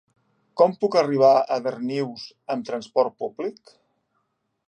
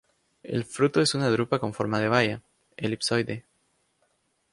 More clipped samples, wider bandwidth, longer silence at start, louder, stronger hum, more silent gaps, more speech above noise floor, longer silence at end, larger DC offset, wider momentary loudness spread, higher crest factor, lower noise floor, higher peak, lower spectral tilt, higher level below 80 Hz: neither; second, 9.4 kHz vs 11.5 kHz; about the same, 0.55 s vs 0.45 s; first, -23 LUFS vs -26 LUFS; neither; neither; first, 52 dB vs 46 dB; about the same, 1.15 s vs 1.1 s; neither; first, 15 LU vs 11 LU; about the same, 20 dB vs 22 dB; about the same, -74 dBFS vs -71 dBFS; about the same, -4 dBFS vs -6 dBFS; about the same, -6 dB/octave vs -5 dB/octave; second, -78 dBFS vs -62 dBFS